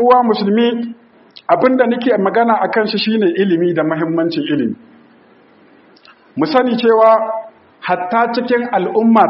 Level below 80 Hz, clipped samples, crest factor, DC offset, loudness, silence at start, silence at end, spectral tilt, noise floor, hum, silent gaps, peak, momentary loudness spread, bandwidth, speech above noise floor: -64 dBFS; under 0.1%; 14 dB; under 0.1%; -14 LUFS; 0 s; 0 s; -4 dB/octave; -47 dBFS; none; none; 0 dBFS; 11 LU; 5.8 kHz; 34 dB